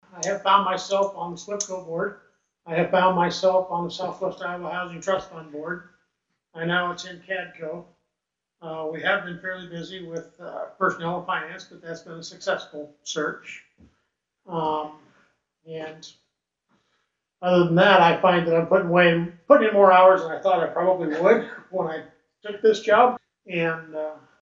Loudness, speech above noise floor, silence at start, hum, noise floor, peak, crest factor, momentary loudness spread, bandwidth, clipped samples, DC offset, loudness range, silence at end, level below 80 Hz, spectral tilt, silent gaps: -22 LUFS; 61 dB; 0.15 s; none; -84 dBFS; -2 dBFS; 22 dB; 20 LU; 7.8 kHz; under 0.1%; under 0.1%; 14 LU; 0.25 s; -66 dBFS; -5 dB/octave; none